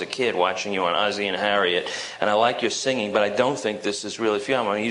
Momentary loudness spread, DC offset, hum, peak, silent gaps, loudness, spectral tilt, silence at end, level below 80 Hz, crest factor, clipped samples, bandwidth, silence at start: 5 LU; under 0.1%; none; -4 dBFS; none; -23 LUFS; -3 dB/octave; 0 s; -66 dBFS; 20 dB; under 0.1%; 11 kHz; 0 s